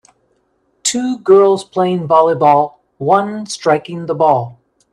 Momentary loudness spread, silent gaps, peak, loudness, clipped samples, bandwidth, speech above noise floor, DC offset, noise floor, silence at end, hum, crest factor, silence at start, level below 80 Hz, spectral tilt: 12 LU; none; 0 dBFS; -14 LUFS; under 0.1%; 12 kHz; 48 dB; under 0.1%; -61 dBFS; 0.4 s; none; 14 dB; 0.85 s; -62 dBFS; -5 dB/octave